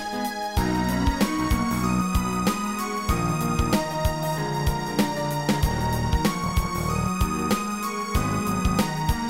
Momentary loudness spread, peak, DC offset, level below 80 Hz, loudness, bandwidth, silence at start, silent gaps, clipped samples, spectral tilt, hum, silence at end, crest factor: 3 LU; -8 dBFS; 0.4%; -32 dBFS; -25 LUFS; 16 kHz; 0 s; none; under 0.1%; -5.5 dB/octave; none; 0 s; 16 dB